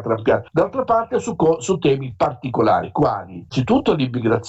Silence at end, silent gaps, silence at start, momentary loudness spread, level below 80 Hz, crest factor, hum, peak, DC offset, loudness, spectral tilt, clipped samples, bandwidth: 0 s; none; 0 s; 5 LU; -48 dBFS; 14 dB; none; -6 dBFS; under 0.1%; -19 LUFS; -6.5 dB/octave; under 0.1%; 8.2 kHz